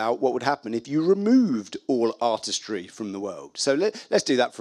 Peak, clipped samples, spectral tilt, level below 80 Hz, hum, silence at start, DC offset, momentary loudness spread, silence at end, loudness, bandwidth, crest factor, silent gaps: -6 dBFS; under 0.1%; -4 dB/octave; -76 dBFS; none; 0 s; under 0.1%; 12 LU; 0 s; -24 LUFS; 11.5 kHz; 18 dB; none